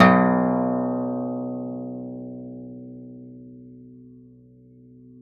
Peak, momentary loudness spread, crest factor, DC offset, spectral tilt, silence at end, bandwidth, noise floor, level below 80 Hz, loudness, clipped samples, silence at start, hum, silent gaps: -2 dBFS; 25 LU; 24 dB; under 0.1%; -6 dB/octave; 0.05 s; 5.6 kHz; -50 dBFS; -64 dBFS; -24 LUFS; under 0.1%; 0 s; none; none